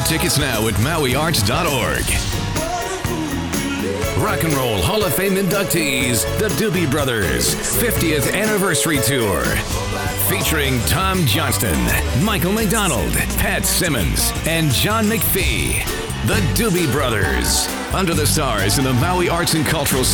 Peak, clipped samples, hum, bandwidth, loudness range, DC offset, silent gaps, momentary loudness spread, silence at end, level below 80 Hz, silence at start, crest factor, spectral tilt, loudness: -6 dBFS; under 0.1%; none; over 20 kHz; 2 LU; under 0.1%; none; 5 LU; 0 s; -30 dBFS; 0 s; 12 dB; -4 dB/octave; -17 LUFS